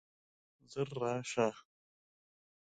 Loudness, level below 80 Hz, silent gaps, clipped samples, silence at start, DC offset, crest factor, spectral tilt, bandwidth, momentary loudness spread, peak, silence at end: -37 LUFS; -78 dBFS; none; under 0.1%; 0.7 s; under 0.1%; 22 dB; -5 dB/octave; 9.4 kHz; 12 LU; -18 dBFS; 1.1 s